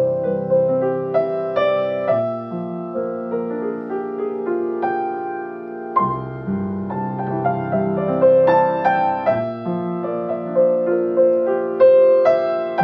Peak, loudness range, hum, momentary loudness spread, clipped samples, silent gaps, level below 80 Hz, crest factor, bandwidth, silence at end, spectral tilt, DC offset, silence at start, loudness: -4 dBFS; 7 LU; none; 12 LU; under 0.1%; none; -60 dBFS; 16 dB; 5 kHz; 0 s; -9.5 dB/octave; under 0.1%; 0 s; -19 LUFS